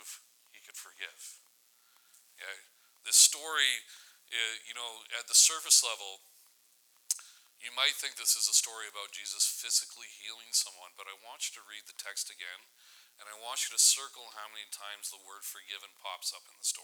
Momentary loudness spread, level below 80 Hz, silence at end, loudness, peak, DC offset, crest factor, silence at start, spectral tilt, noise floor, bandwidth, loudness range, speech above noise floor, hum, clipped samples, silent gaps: 24 LU; under -90 dBFS; 0 s; -28 LUFS; -8 dBFS; under 0.1%; 26 dB; 0 s; 6.5 dB/octave; -67 dBFS; over 20 kHz; 9 LU; 33 dB; none; under 0.1%; none